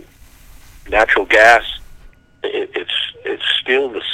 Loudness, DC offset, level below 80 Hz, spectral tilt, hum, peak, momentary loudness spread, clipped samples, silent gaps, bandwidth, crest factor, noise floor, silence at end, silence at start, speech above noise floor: -14 LUFS; under 0.1%; -40 dBFS; -2 dB/octave; none; 0 dBFS; 16 LU; 0.2%; none; 16 kHz; 18 dB; -43 dBFS; 0 s; 0.75 s; 28 dB